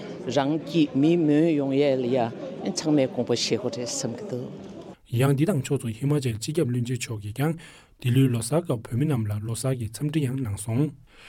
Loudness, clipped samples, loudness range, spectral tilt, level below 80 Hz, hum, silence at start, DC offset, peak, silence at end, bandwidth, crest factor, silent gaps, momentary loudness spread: -25 LUFS; under 0.1%; 3 LU; -6 dB/octave; -58 dBFS; none; 0 s; under 0.1%; -8 dBFS; 0 s; 16.5 kHz; 16 dB; none; 10 LU